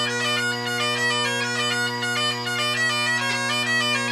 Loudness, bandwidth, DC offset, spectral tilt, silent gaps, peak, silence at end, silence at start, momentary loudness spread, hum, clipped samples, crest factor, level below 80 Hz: -22 LUFS; 15.5 kHz; under 0.1%; -2 dB/octave; none; -10 dBFS; 0 s; 0 s; 3 LU; none; under 0.1%; 12 dB; -72 dBFS